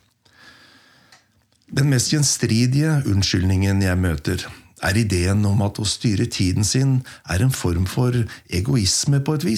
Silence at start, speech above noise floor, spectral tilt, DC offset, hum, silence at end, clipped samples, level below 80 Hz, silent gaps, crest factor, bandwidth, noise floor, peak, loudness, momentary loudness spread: 1.7 s; 42 dB; -5 dB/octave; under 0.1%; none; 0 s; under 0.1%; -46 dBFS; none; 14 dB; 15.5 kHz; -61 dBFS; -6 dBFS; -20 LUFS; 7 LU